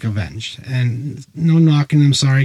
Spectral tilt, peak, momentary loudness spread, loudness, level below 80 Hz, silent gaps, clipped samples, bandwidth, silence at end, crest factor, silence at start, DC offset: -6 dB/octave; -4 dBFS; 13 LU; -16 LUFS; -48 dBFS; none; under 0.1%; 11.5 kHz; 0 s; 12 dB; 0 s; under 0.1%